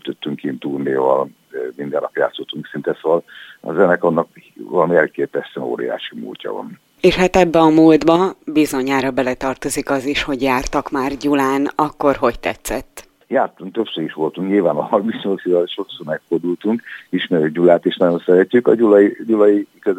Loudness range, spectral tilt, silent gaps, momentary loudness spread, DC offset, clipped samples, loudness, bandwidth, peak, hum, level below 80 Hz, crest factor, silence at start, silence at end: 5 LU; -5.5 dB/octave; none; 13 LU; under 0.1%; under 0.1%; -17 LUFS; 16 kHz; 0 dBFS; none; -44 dBFS; 16 dB; 0.05 s; 0 s